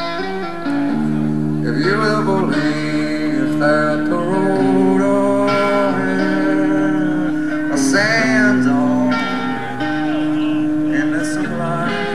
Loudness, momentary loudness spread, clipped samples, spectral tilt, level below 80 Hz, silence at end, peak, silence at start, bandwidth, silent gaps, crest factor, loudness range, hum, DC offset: -17 LUFS; 6 LU; under 0.1%; -6 dB/octave; -50 dBFS; 0 s; -2 dBFS; 0 s; 12.5 kHz; none; 14 dB; 2 LU; none; 3%